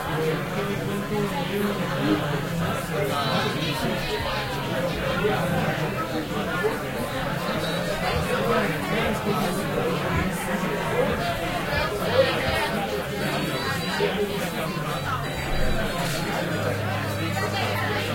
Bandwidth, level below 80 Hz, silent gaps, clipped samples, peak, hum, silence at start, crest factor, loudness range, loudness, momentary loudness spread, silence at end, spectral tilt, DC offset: 16.5 kHz; -40 dBFS; none; under 0.1%; -8 dBFS; none; 0 s; 18 dB; 2 LU; -25 LUFS; 4 LU; 0 s; -5 dB/octave; under 0.1%